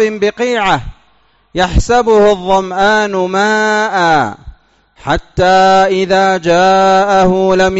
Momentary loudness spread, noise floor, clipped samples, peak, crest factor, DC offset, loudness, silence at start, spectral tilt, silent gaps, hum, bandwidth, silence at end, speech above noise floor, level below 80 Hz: 8 LU; -53 dBFS; under 0.1%; -2 dBFS; 10 dB; under 0.1%; -11 LUFS; 0 s; -3.5 dB/octave; none; none; 8 kHz; 0 s; 42 dB; -28 dBFS